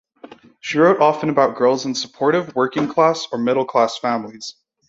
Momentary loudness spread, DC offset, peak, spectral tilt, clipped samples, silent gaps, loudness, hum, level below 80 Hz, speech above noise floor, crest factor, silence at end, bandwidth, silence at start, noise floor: 10 LU; under 0.1%; -2 dBFS; -5 dB/octave; under 0.1%; none; -18 LUFS; none; -64 dBFS; 25 dB; 16 dB; 0.4 s; 8 kHz; 0.25 s; -43 dBFS